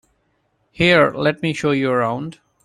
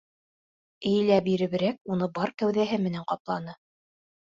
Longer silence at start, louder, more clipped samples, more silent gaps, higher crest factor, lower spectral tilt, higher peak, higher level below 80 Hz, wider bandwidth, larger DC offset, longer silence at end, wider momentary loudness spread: about the same, 0.8 s vs 0.8 s; first, -18 LUFS vs -27 LUFS; neither; second, none vs 1.81-1.85 s, 3.20-3.25 s; about the same, 18 dB vs 18 dB; second, -6 dB/octave vs -7.5 dB/octave; first, -2 dBFS vs -10 dBFS; first, -52 dBFS vs -66 dBFS; first, 12 kHz vs 7.6 kHz; neither; second, 0.35 s vs 0.7 s; about the same, 11 LU vs 11 LU